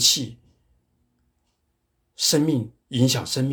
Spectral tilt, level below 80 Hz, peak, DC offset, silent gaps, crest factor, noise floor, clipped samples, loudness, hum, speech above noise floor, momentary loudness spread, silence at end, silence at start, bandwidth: -3.5 dB/octave; -62 dBFS; -4 dBFS; under 0.1%; none; 20 dB; -72 dBFS; under 0.1%; -22 LUFS; none; 51 dB; 10 LU; 0 s; 0 s; over 20 kHz